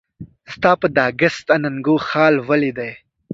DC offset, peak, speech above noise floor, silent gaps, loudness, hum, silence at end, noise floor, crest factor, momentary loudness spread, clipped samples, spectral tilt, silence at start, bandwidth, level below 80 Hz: under 0.1%; 0 dBFS; 21 dB; none; -17 LUFS; none; 0 s; -37 dBFS; 18 dB; 10 LU; under 0.1%; -6.5 dB/octave; 0.2 s; 7.8 kHz; -56 dBFS